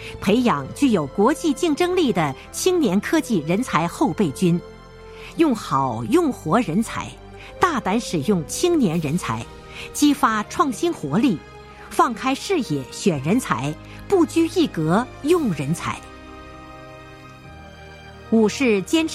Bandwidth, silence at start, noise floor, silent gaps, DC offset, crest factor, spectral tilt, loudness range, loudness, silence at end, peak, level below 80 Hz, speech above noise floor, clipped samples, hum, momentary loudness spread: 15.5 kHz; 0 s; -41 dBFS; none; under 0.1%; 18 dB; -5.5 dB/octave; 4 LU; -21 LUFS; 0 s; -2 dBFS; -46 dBFS; 21 dB; under 0.1%; none; 21 LU